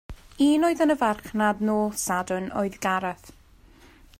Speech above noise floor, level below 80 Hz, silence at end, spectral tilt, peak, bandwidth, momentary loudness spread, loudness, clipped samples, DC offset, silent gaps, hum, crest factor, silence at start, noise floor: 29 dB; -52 dBFS; 0.9 s; -4.5 dB/octave; -10 dBFS; 16 kHz; 8 LU; -24 LUFS; under 0.1%; under 0.1%; none; none; 16 dB; 0.1 s; -53 dBFS